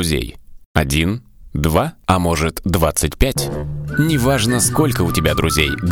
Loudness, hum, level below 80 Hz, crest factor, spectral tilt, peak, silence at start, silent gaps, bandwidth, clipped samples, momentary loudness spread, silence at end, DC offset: -17 LUFS; none; -28 dBFS; 18 dB; -4.5 dB/octave; 0 dBFS; 0 s; 0.66-0.75 s; over 20 kHz; under 0.1%; 7 LU; 0 s; under 0.1%